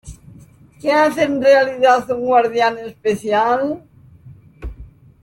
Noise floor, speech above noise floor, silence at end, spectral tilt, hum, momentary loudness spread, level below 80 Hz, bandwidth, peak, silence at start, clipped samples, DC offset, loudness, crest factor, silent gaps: -44 dBFS; 29 dB; 0.35 s; -5 dB/octave; none; 19 LU; -42 dBFS; 16.5 kHz; -2 dBFS; 0.05 s; under 0.1%; under 0.1%; -16 LUFS; 16 dB; none